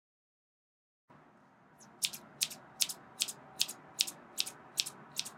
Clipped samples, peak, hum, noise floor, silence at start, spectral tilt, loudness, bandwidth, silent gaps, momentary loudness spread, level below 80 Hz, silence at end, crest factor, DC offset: under 0.1%; -4 dBFS; none; -63 dBFS; 1.1 s; 1 dB/octave; -36 LUFS; 17 kHz; none; 3 LU; -84 dBFS; 0 s; 36 dB; under 0.1%